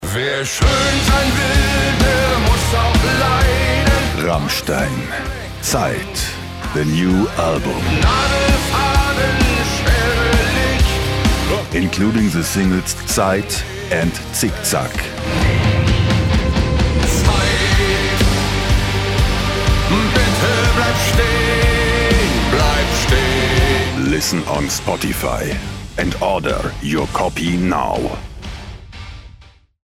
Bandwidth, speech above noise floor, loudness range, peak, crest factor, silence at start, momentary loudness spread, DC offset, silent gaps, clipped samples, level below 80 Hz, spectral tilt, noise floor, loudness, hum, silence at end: 16.5 kHz; 28 dB; 5 LU; -2 dBFS; 14 dB; 0 s; 7 LU; under 0.1%; none; under 0.1%; -22 dBFS; -4.5 dB/octave; -44 dBFS; -16 LUFS; none; 0.6 s